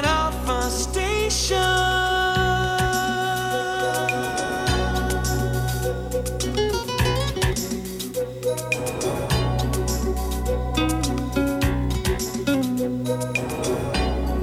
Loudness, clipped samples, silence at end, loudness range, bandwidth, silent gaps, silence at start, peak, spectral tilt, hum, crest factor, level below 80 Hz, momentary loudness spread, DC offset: -23 LUFS; under 0.1%; 0 s; 3 LU; 16 kHz; none; 0 s; -8 dBFS; -4.5 dB/octave; none; 16 dB; -30 dBFS; 6 LU; under 0.1%